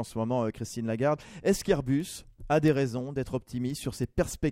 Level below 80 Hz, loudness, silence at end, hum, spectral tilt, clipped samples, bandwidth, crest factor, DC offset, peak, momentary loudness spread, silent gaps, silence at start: -48 dBFS; -30 LUFS; 0 s; none; -6 dB/octave; under 0.1%; 16 kHz; 18 dB; under 0.1%; -10 dBFS; 8 LU; none; 0 s